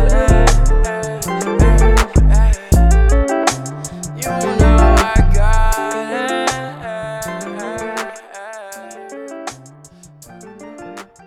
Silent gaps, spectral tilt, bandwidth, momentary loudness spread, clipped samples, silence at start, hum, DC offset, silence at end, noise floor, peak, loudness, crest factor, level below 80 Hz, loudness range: none; -5.5 dB/octave; 14 kHz; 20 LU; under 0.1%; 0 s; none; under 0.1%; 0.25 s; -42 dBFS; 0 dBFS; -16 LUFS; 14 dB; -16 dBFS; 14 LU